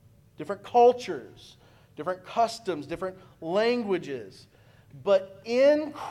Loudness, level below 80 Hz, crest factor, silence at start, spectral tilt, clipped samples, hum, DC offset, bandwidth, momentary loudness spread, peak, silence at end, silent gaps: -26 LUFS; -66 dBFS; 18 dB; 0.4 s; -5 dB/octave; under 0.1%; none; under 0.1%; 12 kHz; 17 LU; -10 dBFS; 0 s; none